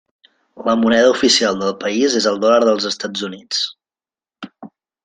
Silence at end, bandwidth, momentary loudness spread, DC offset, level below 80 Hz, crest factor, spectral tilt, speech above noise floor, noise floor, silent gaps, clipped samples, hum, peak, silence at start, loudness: 0.35 s; 9.8 kHz; 16 LU; under 0.1%; -60 dBFS; 16 dB; -3 dB/octave; over 74 dB; under -90 dBFS; none; under 0.1%; none; -2 dBFS; 0.55 s; -16 LUFS